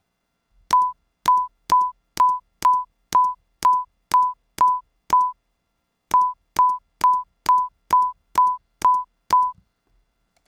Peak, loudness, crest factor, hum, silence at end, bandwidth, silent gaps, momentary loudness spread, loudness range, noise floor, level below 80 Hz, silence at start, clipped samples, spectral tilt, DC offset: -8 dBFS; -21 LUFS; 14 dB; none; 0.95 s; 16.5 kHz; none; 4 LU; 1 LU; -74 dBFS; -58 dBFS; 0.7 s; under 0.1%; -2 dB/octave; under 0.1%